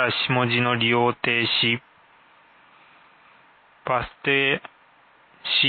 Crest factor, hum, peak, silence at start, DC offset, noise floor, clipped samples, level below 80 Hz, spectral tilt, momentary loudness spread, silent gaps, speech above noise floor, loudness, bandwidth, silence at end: 18 dB; none; -6 dBFS; 0 s; under 0.1%; -56 dBFS; under 0.1%; -58 dBFS; -9.5 dB/octave; 8 LU; none; 33 dB; -21 LUFS; 4.7 kHz; 0 s